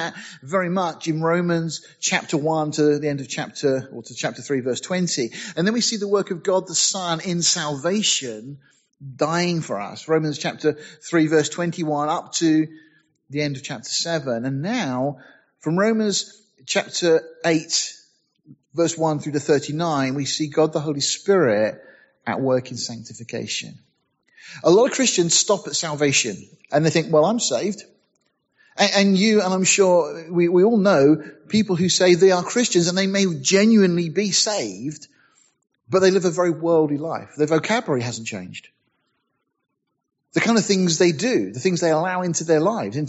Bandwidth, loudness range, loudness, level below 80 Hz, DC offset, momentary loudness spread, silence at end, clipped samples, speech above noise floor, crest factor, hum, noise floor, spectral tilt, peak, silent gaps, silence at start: 8.2 kHz; 6 LU; -20 LUFS; -68 dBFS; under 0.1%; 13 LU; 0 s; under 0.1%; 53 dB; 18 dB; none; -74 dBFS; -4 dB/octave; -4 dBFS; none; 0 s